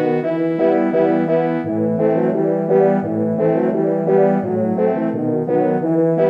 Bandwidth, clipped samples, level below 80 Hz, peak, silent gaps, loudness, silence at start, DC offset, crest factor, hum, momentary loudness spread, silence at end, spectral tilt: 5.2 kHz; under 0.1%; -64 dBFS; -2 dBFS; none; -17 LUFS; 0 s; under 0.1%; 14 dB; none; 5 LU; 0 s; -10.5 dB/octave